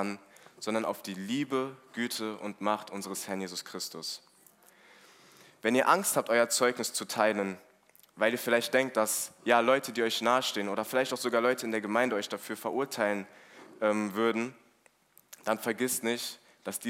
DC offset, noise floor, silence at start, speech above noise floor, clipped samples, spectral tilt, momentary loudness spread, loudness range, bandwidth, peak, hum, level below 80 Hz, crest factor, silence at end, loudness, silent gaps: under 0.1%; -66 dBFS; 0 s; 36 dB; under 0.1%; -3 dB/octave; 12 LU; 7 LU; 16 kHz; -8 dBFS; none; -86 dBFS; 22 dB; 0 s; -30 LUFS; none